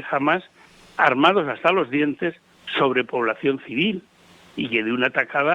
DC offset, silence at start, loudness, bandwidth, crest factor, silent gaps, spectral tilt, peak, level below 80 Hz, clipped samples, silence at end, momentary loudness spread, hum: under 0.1%; 0 s; -21 LUFS; 9.2 kHz; 20 dB; none; -6.5 dB/octave; -2 dBFS; -66 dBFS; under 0.1%; 0 s; 11 LU; none